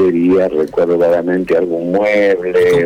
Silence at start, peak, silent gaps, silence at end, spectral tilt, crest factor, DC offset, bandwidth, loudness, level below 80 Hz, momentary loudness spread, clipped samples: 0 s; -6 dBFS; none; 0 s; -7 dB/octave; 6 dB; under 0.1%; 14 kHz; -13 LUFS; -48 dBFS; 3 LU; under 0.1%